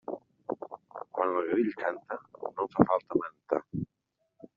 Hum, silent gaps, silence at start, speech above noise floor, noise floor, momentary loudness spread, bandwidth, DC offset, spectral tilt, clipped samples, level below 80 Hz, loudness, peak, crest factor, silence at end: none; none; 0.1 s; 51 dB; -80 dBFS; 15 LU; 5.4 kHz; under 0.1%; -7.5 dB/octave; under 0.1%; -64 dBFS; -32 LUFS; -4 dBFS; 28 dB; 0.1 s